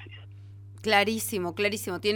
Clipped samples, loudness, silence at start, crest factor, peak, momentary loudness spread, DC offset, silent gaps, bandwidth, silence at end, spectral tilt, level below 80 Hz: under 0.1%; -27 LUFS; 0 s; 22 dB; -8 dBFS; 24 LU; under 0.1%; none; over 20 kHz; 0 s; -3.5 dB/octave; -64 dBFS